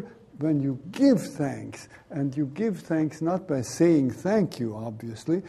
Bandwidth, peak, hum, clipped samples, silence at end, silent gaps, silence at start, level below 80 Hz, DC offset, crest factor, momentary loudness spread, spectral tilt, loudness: 13.5 kHz; -8 dBFS; none; under 0.1%; 0 s; none; 0 s; -64 dBFS; under 0.1%; 18 dB; 14 LU; -7 dB/octave; -26 LUFS